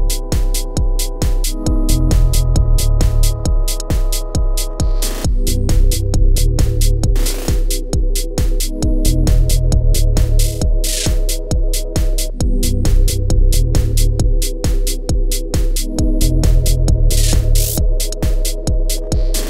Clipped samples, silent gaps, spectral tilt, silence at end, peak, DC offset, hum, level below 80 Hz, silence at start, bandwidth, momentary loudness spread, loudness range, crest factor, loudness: under 0.1%; none; -5 dB/octave; 0 s; -2 dBFS; under 0.1%; none; -14 dBFS; 0 s; 16 kHz; 5 LU; 1 LU; 12 dB; -17 LUFS